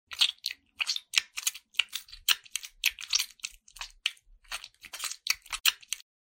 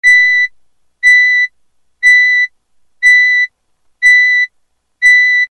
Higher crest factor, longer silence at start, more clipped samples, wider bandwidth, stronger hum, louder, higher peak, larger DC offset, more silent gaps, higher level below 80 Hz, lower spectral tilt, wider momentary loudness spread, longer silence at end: first, 30 dB vs 10 dB; about the same, 0.1 s vs 0.05 s; neither; first, 17 kHz vs 10.5 kHz; neither; second, -30 LUFS vs -8 LUFS; about the same, -4 dBFS vs -2 dBFS; neither; neither; second, -64 dBFS vs -54 dBFS; about the same, 4.5 dB/octave vs 5 dB/octave; first, 14 LU vs 11 LU; first, 0.35 s vs 0.05 s